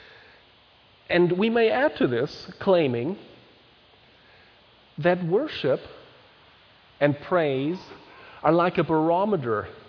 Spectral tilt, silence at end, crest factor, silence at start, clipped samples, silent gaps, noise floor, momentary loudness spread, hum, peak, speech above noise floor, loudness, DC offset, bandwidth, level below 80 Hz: -8 dB/octave; 0.1 s; 20 dB; 1.1 s; under 0.1%; none; -56 dBFS; 11 LU; none; -6 dBFS; 33 dB; -24 LUFS; under 0.1%; 5.4 kHz; -62 dBFS